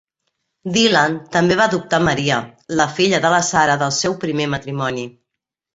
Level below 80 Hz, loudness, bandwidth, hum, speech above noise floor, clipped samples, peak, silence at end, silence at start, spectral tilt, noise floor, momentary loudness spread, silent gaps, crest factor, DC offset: -52 dBFS; -17 LUFS; 8.2 kHz; none; 65 dB; under 0.1%; -2 dBFS; 0.65 s; 0.65 s; -4 dB/octave; -82 dBFS; 9 LU; none; 16 dB; under 0.1%